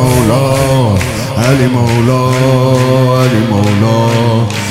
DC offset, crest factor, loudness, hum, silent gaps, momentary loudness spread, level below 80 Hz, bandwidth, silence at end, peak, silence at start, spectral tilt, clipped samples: 0.7%; 10 dB; -10 LUFS; none; none; 3 LU; -34 dBFS; 16 kHz; 0 s; 0 dBFS; 0 s; -6 dB/octave; 0.3%